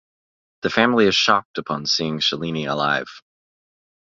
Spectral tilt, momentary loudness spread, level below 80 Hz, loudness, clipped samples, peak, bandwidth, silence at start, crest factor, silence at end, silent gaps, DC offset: -3.5 dB/octave; 10 LU; -58 dBFS; -20 LUFS; under 0.1%; 0 dBFS; 7.6 kHz; 0.65 s; 22 dB; 1 s; 1.45-1.54 s; under 0.1%